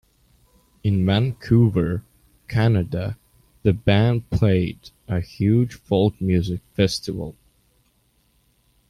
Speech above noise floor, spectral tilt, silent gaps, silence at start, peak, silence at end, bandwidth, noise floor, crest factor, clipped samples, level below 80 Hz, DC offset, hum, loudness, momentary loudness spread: 44 dB; -7.5 dB/octave; none; 0.85 s; -4 dBFS; 1.6 s; 12.5 kHz; -64 dBFS; 18 dB; under 0.1%; -44 dBFS; under 0.1%; none; -22 LUFS; 12 LU